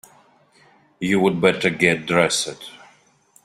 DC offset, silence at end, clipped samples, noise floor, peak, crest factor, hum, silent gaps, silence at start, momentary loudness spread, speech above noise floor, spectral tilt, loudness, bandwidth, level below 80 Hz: under 0.1%; 0.7 s; under 0.1%; -57 dBFS; -2 dBFS; 20 dB; none; none; 1 s; 12 LU; 37 dB; -4 dB/octave; -19 LUFS; 15 kHz; -58 dBFS